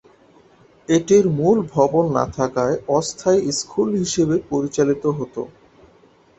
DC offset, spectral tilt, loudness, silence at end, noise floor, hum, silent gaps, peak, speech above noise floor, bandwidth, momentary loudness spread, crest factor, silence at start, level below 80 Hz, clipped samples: under 0.1%; -5.5 dB/octave; -19 LUFS; 0.9 s; -53 dBFS; none; none; -2 dBFS; 34 dB; 8.2 kHz; 8 LU; 18 dB; 0.9 s; -52 dBFS; under 0.1%